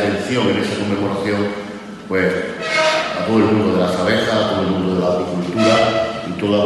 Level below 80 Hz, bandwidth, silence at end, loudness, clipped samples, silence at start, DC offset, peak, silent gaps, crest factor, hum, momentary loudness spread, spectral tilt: -50 dBFS; 12 kHz; 0 s; -17 LUFS; under 0.1%; 0 s; under 0.1%; -4 dBFS; none; 14 dB; none; 7 LU; -5.5 dB/octave